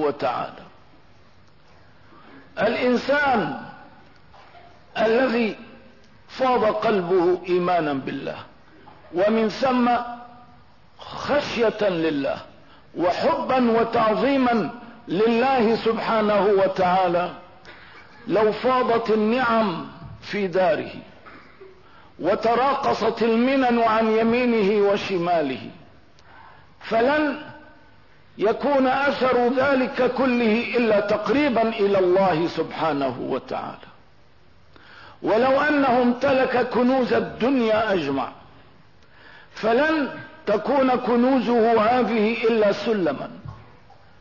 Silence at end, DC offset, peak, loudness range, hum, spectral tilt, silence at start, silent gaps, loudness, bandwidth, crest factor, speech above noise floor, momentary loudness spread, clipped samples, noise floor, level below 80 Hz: 0.65 s; 0.3%; -10 dBFS; 5 LU; none; -6.5 dB/octave; 0 s; none; -21 LUFS; 6 kHz; 12 dB; 35 dB; 13 LU; under 0.1%; -56 dBFS; -58 dBFS